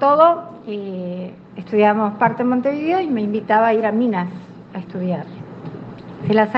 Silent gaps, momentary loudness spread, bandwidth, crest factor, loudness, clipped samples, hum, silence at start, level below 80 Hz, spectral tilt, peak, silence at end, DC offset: none; 19 LU; 6 kHz; 18 dB; -19 LUFS; under 0.1%; none; 0 s; -64 dBFS; -9 dB/octave; 0 dBFS; 0 s; under 0.1%